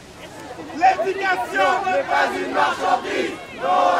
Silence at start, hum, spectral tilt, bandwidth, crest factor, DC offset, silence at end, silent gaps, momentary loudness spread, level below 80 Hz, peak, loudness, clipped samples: 0 s; none; -3.5 dB/octave; 15 kHz; 16 dB; under 0.1%; 0 s; none; 16 LU; -56 dBFS; -4 dBFS; -20 LUFS; under 0.1%